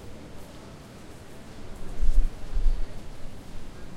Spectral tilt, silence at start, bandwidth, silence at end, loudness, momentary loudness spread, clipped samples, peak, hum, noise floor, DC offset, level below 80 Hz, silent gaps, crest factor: -6 dB/octave; 0 s; 8.2 kHz; 0 s; -37 LUFS; 15 LU; under 0.1%; -6 dBFS; none; -44 dBFS; under 0.1%; -28 dBFS; none; 18 dB